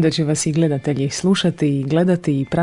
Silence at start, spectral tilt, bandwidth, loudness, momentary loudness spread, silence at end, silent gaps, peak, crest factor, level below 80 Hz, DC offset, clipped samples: 0 s; -5.5 dB/octave; 11 kHz; -18 LUFS; 3 LU; 0 s; none; -6 dBFS; 12 dB; -50 dBFS; under 0.1%; under 0.1%